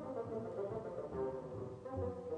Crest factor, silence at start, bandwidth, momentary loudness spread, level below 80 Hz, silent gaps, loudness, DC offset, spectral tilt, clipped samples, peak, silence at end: 12 dB; 0 s; 9.6 kHz; 4 LU; -64 dBFS; none; -44 LUFS; under 0.1%; -9 dB/octave; under 0.1%; -30 dBFS; 0 s